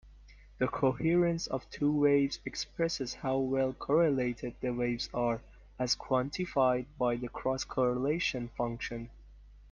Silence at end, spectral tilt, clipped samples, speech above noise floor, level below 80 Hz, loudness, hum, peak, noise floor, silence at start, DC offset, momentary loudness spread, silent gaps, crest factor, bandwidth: 0.05 s; -5.5 dB/octave; under 0.1%; 23 dB; -54 dBFS; -32 LUFS; none; -14 dBFS; -55 dBFS; 0.05 s; under 0.1%; 8 LU; none; 18 dB; 9.8 kHz